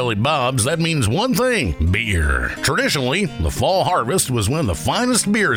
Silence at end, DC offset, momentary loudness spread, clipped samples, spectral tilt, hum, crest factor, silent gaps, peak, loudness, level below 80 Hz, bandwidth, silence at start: 0 s; under 0.1%; 3 LU; under 0.1%; -4 dB/octave; none; 14 dB; none; -4 dBFS; -18 LUFS; -30 dBFS; 19.5 kHz; 0 s